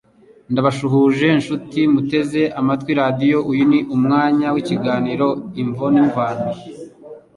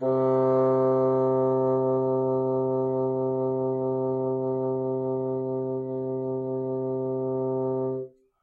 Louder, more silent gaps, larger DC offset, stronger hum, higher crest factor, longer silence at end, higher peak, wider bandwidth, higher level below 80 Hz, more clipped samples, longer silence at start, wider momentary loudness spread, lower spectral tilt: first, -17 LUFS vs -26 LUFS; neither; neither; neither; about the same, 14 dB vs 12 dB; second, 0.2 s vs 0.35 s; first, -2 dBFS vs -14 dBFS; first, 11 kHz vs 2.4 kHz; first, -56 dBFS vs -70 dBFS; neither; first, 0.5 s vs 0 s; about the same, 9 LU vs 7 LU; second, -7.5 dB/octave vs -12 dB/octave